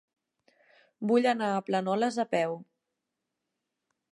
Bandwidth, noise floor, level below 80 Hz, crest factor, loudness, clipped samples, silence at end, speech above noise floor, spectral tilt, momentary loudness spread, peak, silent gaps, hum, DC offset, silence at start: 11.5 kHz; -85 dBFS; -86 dBFS; 18 dB; -28 LUFS; under 0.1%; 1.5 s; 58 dB; -5.5 dB/octave; 9 LU; -14 dBFS; none; none; under 0.1%; 1 s